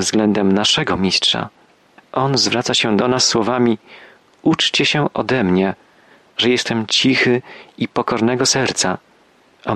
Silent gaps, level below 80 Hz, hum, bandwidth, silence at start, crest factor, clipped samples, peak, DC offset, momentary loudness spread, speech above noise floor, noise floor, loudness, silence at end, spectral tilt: none; -54 dBFS; none; 12.5 kHz; 0 s; 16 dB; under 0.1%; -2 dBFS; under 0.1%; 9 LU; 36 dB; -53 dBFS; -16 LUFS; 0 s; -3.5 dB/octave